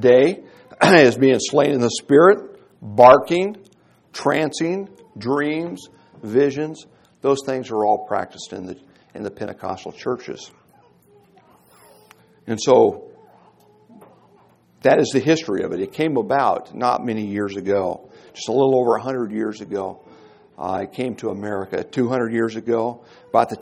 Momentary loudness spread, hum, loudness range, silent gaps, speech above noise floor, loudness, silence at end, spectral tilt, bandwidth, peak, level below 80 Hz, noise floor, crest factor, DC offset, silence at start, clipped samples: 19 LU; none; 11 LU; none; 36 dB; -19 LUFS; 0 s; -5.5 dB/octave; 12.5 kHz; 0 dBFS; -62 dBFS; -55 dBFS; 20 dB; under 0.1%; 0 s; under 0.1%